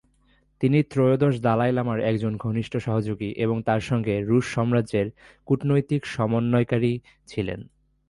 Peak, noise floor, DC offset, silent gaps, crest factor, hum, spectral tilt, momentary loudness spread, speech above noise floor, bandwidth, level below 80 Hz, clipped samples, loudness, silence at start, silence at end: -8 dBFS; -63 dBFS; under 0.1%; none; 16 dB; none; -8 dB/octave; 9 LU; 39 dB; 11.5 kHz; -52 dBFS; under 0.1%; -24 LUFS; 0.6 s; 0.45 s